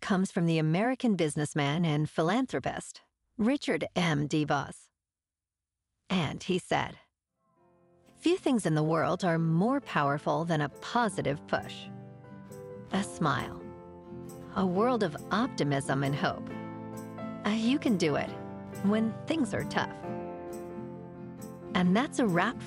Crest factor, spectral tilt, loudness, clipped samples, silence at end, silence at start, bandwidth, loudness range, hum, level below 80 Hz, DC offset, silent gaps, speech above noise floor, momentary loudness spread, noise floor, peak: 18 dB; -6 dB/octave; -30 LUFS; under 0.1%; 0 s; 0 s; 14.5 kHz; 5 LU; none; -62 dBFS; under 0.1%; none; over 61 dB; 16 LU; under -90 dBFS; -12 dBFS